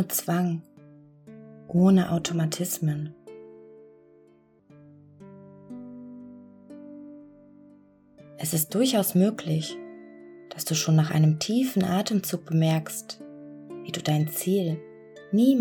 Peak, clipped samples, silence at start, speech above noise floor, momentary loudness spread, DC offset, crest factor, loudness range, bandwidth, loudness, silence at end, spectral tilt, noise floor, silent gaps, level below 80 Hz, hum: -10 dBFS; under 0.1%; 0 s; 35 dB; 24 LU; under 0.1%; 18 dB; 21 LU; 19 kHz; -25 LUFS; 0 s; -5.5 dB/octave; -59 dBFS; none; -66 dBFS; none